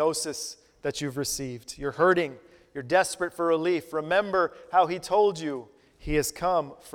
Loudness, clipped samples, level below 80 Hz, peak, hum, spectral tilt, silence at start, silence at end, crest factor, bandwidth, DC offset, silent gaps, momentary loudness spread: -27 LUFS; under 0.1%; -50 dBFS; -8 dBFS; none; -4 dB/octave; 0 s; 0.05 s; 18 dB; 18.5 kHz; under 0.1%; none; 12 LU